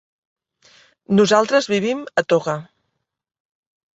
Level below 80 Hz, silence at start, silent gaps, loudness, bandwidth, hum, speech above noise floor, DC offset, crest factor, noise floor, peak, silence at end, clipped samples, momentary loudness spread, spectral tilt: -64 dBFS; 1.1 s; none; -18 LUFS; 8 kHz; none; 58 dB; under 0.1%; 20 dB; -75 dBFS; -2 dBFS; 1.35 s; under 0.1%; 9 LU; -5 dB/octave